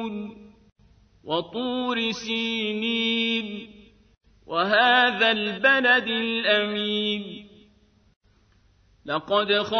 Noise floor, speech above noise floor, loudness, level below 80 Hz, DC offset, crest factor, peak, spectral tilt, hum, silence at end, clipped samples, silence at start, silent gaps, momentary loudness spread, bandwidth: -60 dBFS; 37 dB; -23 LUFS; -62 dBFS; under 0.1%; 20 dB; -6 dBFS; -4 dB/octave; none; 0 s; under 0.1%; 0 s; 0.72-0.76 s, 8.16-8.21 s; 16 LU; 6.6 kHz